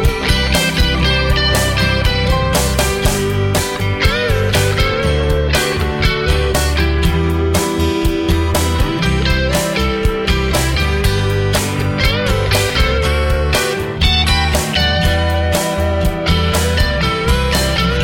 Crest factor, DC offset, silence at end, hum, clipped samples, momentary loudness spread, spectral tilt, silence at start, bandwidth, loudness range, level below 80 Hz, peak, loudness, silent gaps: 12 dB; under 0.1%; 0 s; none; under 0.1%; 3 LU; -4.5 dB/octave; 0 s; 17 kHz; 1 LU; -20 dBFS; -2 dBFS; -15 LUFS; none